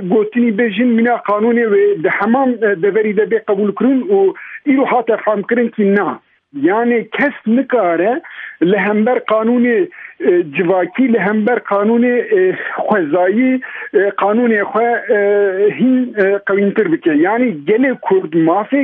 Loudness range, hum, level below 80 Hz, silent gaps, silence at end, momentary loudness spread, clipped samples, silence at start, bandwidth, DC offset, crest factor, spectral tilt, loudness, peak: 2 LU; none; -68 dBFS; none; 0 s; 4 LU; under 0.1%; 0 s; 3.9 kHz; under 0.1%; 12 dB; -10 dB/octave; -14 LUFS; 0 dBFS